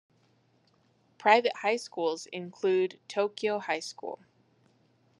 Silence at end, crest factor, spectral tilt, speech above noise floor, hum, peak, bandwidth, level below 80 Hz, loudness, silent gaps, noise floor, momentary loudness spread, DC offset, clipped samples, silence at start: 1.05 s; 24 dB; -3.5 dB/octave; 39 dB; none; -6 dBFS; 11 kHz; under -90 dBFS; -29 LUFS; none; -68 dBFS; 16 LU; under 0.1%; under 0.1%; 1.2 s